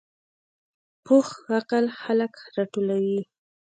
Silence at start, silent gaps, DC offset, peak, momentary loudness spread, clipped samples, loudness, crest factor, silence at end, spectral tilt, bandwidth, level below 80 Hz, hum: 1.05 s; none; under 0.1%; -8 dBFS; 9 LU; under 0.1%; -25 LUFS; 18 dB; 0.45 s; -6.5 dB/octave; 9.2 kHz; -78 dBFS; none